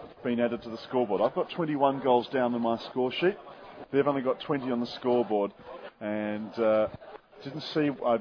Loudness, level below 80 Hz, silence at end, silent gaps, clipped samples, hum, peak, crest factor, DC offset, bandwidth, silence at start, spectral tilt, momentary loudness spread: -29 LUFS; -66 dBFS; 0 s; none; under 0.1%; none; -10 dBFS; 18 dB; under 0.1%; 5.4 kHz; 0 s; -7.5 dB/octave; 16 LU